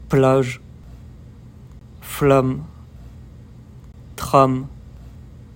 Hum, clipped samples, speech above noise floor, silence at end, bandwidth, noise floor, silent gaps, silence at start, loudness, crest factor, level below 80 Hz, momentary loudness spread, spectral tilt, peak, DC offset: none; under 0.1%; 25 dB; 0.2 s; 16.5 kHz; -41 dBFS; none; 0 s; -18 LUFS; 20 dB; -42 dBFS; 26 LU; -7 dB/octave; 0 dBFS; under 0.1%